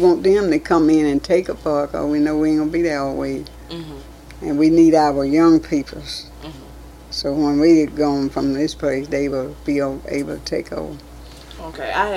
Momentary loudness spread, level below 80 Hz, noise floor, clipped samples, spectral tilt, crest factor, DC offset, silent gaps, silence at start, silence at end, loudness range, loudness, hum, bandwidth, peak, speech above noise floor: 19 LU; -40 dBFS; -38 dBFS; under 0.1%; -6 dB/octave; 16 dB; under 0.1%; none; 0 s; 0 s; 5 LU; -18 LUFS; none; 12.5 kHz; -2 dBFS; 21 dB